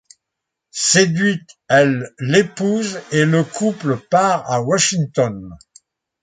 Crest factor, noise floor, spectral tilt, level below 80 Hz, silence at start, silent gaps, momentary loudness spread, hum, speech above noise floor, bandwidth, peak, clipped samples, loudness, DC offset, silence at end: 18 dB; -81 dBFS; -4 dB/octave; -56 dBFS; 0.75 s; none; 8 LU; none; 64 dB; 9.6 kHz; 0 dBFS; under 0.1%; -17 LUFS; under 0.1%; 0.65 s